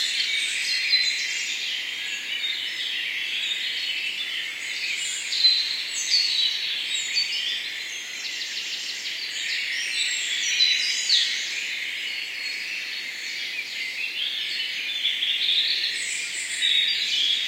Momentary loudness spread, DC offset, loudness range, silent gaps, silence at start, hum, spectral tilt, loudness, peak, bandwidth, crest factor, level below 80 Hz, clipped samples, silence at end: 9 LU; under 0.1%; 4 LU; none; 0 s; none; 3.5 dB/octave; -23 LUFS; -6 dBFS; 16 kHz; 20 dB; -80 dBFS; under 0.1%; 0 s